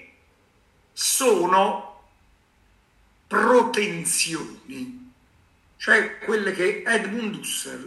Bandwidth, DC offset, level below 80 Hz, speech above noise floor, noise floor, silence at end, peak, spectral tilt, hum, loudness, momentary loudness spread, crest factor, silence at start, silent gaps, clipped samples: 13 kHz; under 0.1%; -64 dBFS; 38 dB; -61 dBFS; 0 s; -4 dBFS; -2.5 dB/octave; none; -22 LUFS; 18 LU; 20 dB; 0 s; none; under 0.1%